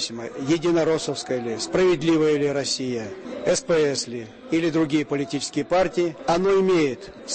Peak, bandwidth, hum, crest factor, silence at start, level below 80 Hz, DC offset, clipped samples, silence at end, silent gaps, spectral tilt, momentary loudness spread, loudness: -10 dBFS; 8.8 kHz; none; 12 dB; 0 s; -54 dBFS; under 0.1%; under 0.1%; 0 s; none; -4.5 dB/octave; 9 LU; -23 LUFS